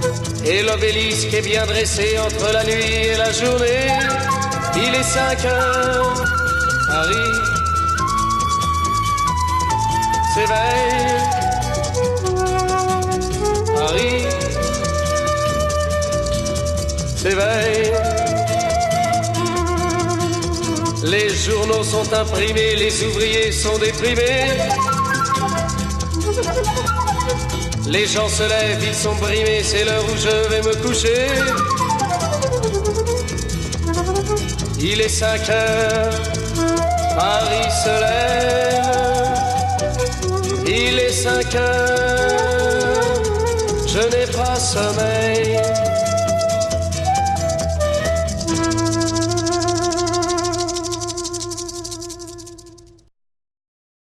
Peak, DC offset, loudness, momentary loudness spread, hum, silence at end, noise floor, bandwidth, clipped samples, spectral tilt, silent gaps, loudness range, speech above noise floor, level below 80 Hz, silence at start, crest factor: -4 dBFS; under 0.1%; -18 LUFS; 4 LU; none; 1.3 s; -46 dBFS; 14.5 kHz; under 0.1%; -4 dB/octave; none; 2 LU; 29 dB; -32 dBFS; 0 s; 14 dB